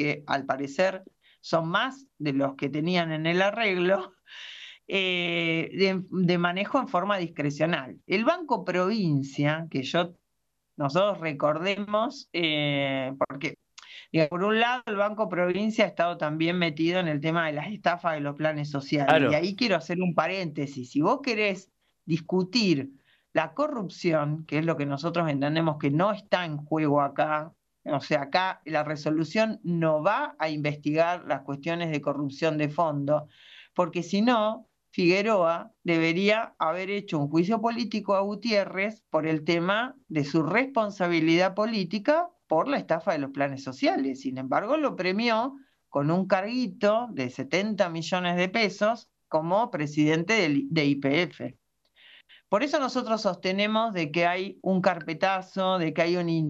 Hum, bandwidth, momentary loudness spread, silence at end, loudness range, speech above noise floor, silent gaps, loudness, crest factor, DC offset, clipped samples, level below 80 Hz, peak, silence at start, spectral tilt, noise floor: none; 8 kHz; 7 LU; 0 s; 2 LU; 54 dB; none; -27 LUFS; 20 dB; under 0.1%; under 0.1%; -72 dBFS; -6 dBFS; 0 s; -6 dB/octave; -80 dBFS